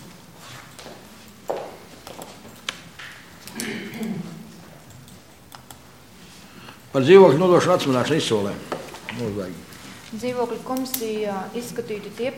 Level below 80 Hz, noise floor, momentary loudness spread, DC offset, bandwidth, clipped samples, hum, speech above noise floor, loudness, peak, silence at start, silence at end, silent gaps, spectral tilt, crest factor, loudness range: -60 dBFS; -47 dBFS; 25 LU; 0.2%; 17 kHz; under 0.1%; none; 27 dB; -21 LUFS; 0 dBFS; 0 s; 0 s; none; -5.5 dB/octave; 24 dB; 17 LU